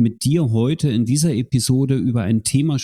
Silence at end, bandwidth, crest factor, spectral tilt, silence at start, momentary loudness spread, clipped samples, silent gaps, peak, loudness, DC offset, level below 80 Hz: 0 s; 14 kHz; 12 dB; -6 dB/octave; 0 s; 2 LU; under 0.1%; none; -6 dBFS; -18 LUFS; under 0.1%; -48 dBFS